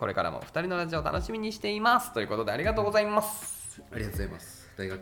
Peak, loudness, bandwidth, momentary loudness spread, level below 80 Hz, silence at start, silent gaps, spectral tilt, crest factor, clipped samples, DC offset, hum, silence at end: -10 dBFS; -30 LUFS; 20 kHz; 14 LU; -46 dBFS; 0 s; none; -4.5 dB/octave; 20 dB; under 0.1%; under 0.1%; none; 0 s